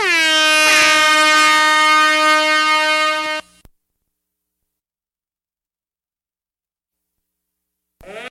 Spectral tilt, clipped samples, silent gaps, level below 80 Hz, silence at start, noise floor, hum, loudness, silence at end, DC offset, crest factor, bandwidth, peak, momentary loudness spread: 1 dB/octave; under 0.1%; none; -58 dBFS; 0 s; under -90 dBFS; none; -11 LUFS; 0 s; under 0.1%; 14 dB; 13.5 kHz; -2 dBFS; 7 LU